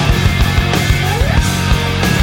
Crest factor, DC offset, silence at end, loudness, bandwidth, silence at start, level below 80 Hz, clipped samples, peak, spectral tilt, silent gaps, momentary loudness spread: 12 dB; under 0.1%; 0 s; -14 LUFS; 17.5 kHz; 0 s; -18 dBFS; under 0.1%; 0 dBFS; -5 dB/octave; none; 1 LU